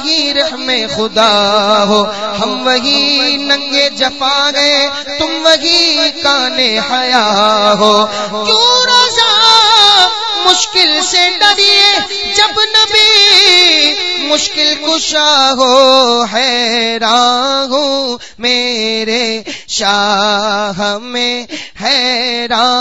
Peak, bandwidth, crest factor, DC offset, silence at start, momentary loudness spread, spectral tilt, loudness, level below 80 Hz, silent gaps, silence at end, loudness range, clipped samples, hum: 0 dBFS; 11 kHz; 10 dB; 1%; 0 s; 9 LU; -1 dB/octave; -9 LUFS; -48 dBFS; none; 0 s; 6 LU; 0.3%; none